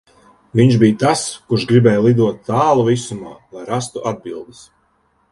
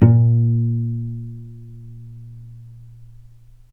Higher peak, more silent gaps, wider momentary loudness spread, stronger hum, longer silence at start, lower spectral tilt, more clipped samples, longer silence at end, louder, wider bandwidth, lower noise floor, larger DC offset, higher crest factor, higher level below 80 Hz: about the same, 0 dBFS vs 0 dBFS; neither; second, 18 LU vs 25 LU; neither; first, 0.55 s vs 0 s; second, -6.5 dB/octave vs -12.5 dB/octave; neither; first, 0.9 s vs 0.7 s; first, -15 LUFS vs -19 LUFS; first, 11.5 kHz vs 2.4 kHz; first, -61 dBFS vs -45 dBFS; neither; about the same, 16 dB vs 20 dB; second, -52 dBFS vs -46 dBFS